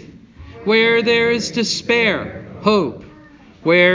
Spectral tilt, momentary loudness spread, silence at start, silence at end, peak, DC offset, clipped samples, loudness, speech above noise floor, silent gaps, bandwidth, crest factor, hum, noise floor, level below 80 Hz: -4 dB/octave; 13 LU; 0.4 s; 0 s; 0 dBFS; under 0.1%; under 0.1%; -16 LUFS; 28 dB; none; 7.6 kHz; 16 dB; none; -44 dBFS; -48 dBFS